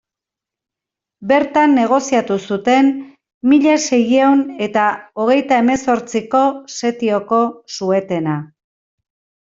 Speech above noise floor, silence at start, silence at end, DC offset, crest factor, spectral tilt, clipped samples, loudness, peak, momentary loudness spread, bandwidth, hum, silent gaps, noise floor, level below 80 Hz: 71 dB; 1.2 s; 1.1 s; under 0.1%; 14 dB; -5 dB/octave; under 0.1%; -15 LUFS; -2 dBFS; 9 LU; 7.8 kHz; none; 3.34-3.41 s; -86 dBFS; -58 dBFS